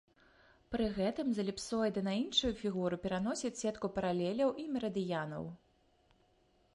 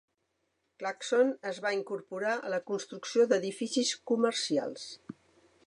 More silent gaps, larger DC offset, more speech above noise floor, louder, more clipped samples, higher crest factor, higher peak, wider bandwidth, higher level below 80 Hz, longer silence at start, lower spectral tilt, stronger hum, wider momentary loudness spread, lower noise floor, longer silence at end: neither; neither; second, 36 dB vs 48 dB; second, -36 LUFS vs -31 LUFS; neither; about the same, 20 dB vs 18 dB; second, -18 dBFS vs -14 dBFS; about the same, 11.5 kHz vs 11 kHz; first, -60 dBFS vs -84 dBFS; about the same, 0.7 s vs 0.8 s; first, -5 dB/octave vs -3 dB/octave; neither; second, 6 LU vs 12 LU; second, -71 dBFS vs -79 dBFS; first, 1.2 s vs 0.55 s